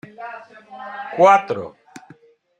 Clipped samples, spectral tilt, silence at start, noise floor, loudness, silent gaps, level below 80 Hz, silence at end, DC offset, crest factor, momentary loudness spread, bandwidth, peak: under 0.1%; -5 dB/octave; 0.2 s; -50 dBFS; -16 LUFS; none; -72 dBFS; 0.9 s; under 0.1%; 20 dB; 23 LU; 9.2 kHz; -2 dBFS